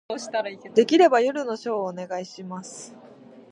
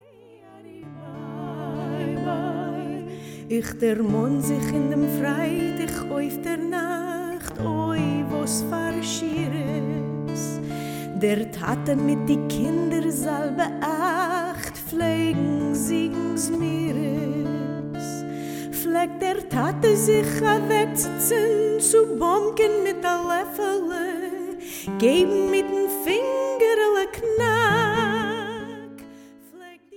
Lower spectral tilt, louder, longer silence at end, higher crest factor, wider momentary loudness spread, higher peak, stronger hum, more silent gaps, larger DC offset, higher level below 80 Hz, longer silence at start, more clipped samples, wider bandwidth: about the same, -4.5 dB/octave vs -5 dB/octave; about the same, -23 LUFS vs -24 LUFS; about the same, 0.1 s vs 0 s; about the same, 20 dB vs 18 dB; first, 20 LU vs 11 LU; about the same, -4 dBFS vs -6 dBFS; neither; neither; neither; second, -78 dBFS vs -52 dBFS; second, 0.1 s vs 0.3 s; neither; second, 11 kHz vs 18 kHz